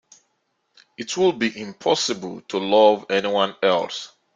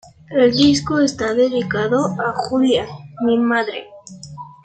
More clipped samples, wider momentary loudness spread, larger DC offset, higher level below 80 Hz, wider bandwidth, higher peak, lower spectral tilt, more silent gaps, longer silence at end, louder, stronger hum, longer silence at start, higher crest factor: neither; second, 14 LU vs 17 LU; neither; second, -68 dBFS vs -52 dBFS; about the same, 9.4 kHz vs 9.2 kHz; about the same, -2 dBFS vs -2 dBFS; second, -3.5 dB/octave vs -5 dB/octave; neither; first, 0.3 s vs 0.15 s; second, -21 LUFS vs -17 LUFS; neither; first, 1 s vs 0.3 s; about the same, 20 dB vs 16 dB